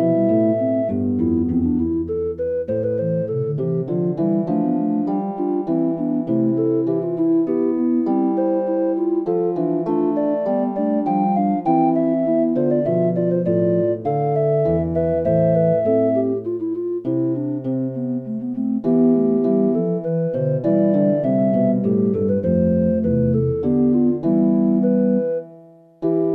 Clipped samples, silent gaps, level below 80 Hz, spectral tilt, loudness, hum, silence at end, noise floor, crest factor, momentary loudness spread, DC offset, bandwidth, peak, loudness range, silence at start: under 0.1%; none; -48 dBFS; -12.5 dB/octave; -19 LUFS; none; 0 s; -45 dBFS; 12 dB; 6 LU; under 0.1%; 3.5 kHz; -6 dBFS; 3 LU; 0 s